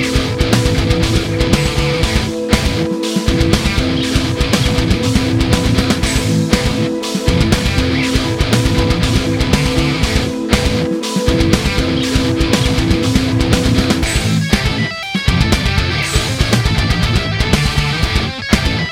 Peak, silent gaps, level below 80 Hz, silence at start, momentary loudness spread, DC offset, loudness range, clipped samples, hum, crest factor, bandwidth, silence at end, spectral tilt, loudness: 0 dBFS; none; -22 dBFS; 0 s; 3 LU; under 0.1%; 1 LU; under 0.1%; none; 14 dB; 17 kHz; 0 s; -5 dB/octave; -14 LUFS